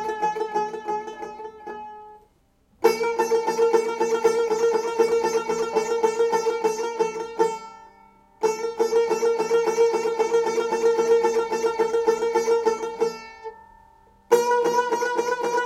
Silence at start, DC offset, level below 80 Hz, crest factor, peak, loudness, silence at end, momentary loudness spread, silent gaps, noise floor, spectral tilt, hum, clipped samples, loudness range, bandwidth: 0 s; under 0.1%; -64 dBFS; 20 dB; -4 dBFS; -23 LUFS; 0 s; 15 LU; none; -62 dBFS; -3 dB/octave; none; under 0.1%; 3 LU; 14.5 kHz